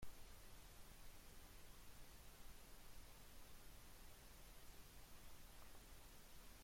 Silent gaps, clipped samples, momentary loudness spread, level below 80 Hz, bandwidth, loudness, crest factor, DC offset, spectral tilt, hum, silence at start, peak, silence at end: none; under 0.1%; 0 LU; -64 dBFS; 16.5 kHz; -64 LUFS; 16 dB; under 0.1%; -3 dB/octave; none; 0 s; -42 dBFS; 0 s